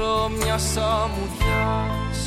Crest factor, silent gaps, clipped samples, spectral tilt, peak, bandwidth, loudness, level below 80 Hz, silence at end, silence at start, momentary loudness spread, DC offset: 12 dB; none; under 0.1%; -4.5 dB/octave; -10 dBFS; 17 kHz; -23 LUFS; -30 dBFS; 0 s; 0 s; 3 LU; under 0.1%